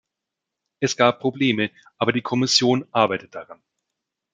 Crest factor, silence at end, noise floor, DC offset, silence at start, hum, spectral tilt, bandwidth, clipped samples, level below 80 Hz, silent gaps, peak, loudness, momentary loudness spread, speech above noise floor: 20 dB; 0.8 s; -84 dBFS; under 0.1%; 0.8 s; none; -4 dB/octave; 9.4 kHz; under 0.1%; -68 dBFS; none; -2 dBFS; -21 LUFS; 11 LU; 63 dB